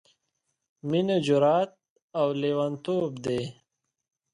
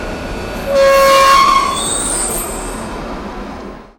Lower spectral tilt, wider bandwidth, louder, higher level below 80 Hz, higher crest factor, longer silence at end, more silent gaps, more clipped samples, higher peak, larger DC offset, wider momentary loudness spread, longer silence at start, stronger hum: first, -7 dB/octave vs -2 dB/octave; second, 11 kHz vs 17 kHz; second, -27 LUFS vs -12 LUFS; second, -68 dBFS vs -30 dBFS; about the same, 18 dB vs 14 dB; first, 0.8 s vs 0.15 s; first, 1.90-1.96 s, 2.02-2.08 s vs none; neither; second, -12 dBFS vs 0 dBFS; neither; second, 12 LU vs 18 LU; first, 0.85 s vs 0 s; neither